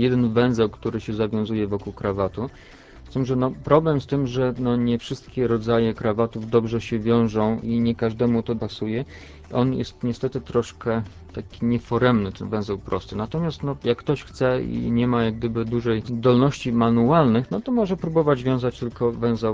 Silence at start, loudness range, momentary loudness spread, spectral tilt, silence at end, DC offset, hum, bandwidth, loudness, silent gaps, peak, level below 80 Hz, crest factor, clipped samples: 0 s; 5 LU; 8 LU; -8 dB/octave; 0 s; under 0.1%; none; 7.8 kHz; -23 LUFS; none; -4 dBFS; -44 dBFS; 18 dB; under 0.1%